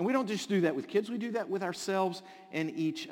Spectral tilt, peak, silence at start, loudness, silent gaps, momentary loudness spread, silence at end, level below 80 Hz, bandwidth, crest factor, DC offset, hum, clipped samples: -5.5 dB/octave; -14 dBFS; 0 s; -33 LUFS; none; 6 LU; 0 s; -84 dBFS; 17 kHz; 18 dB; under 0.1%; none; under 0.1%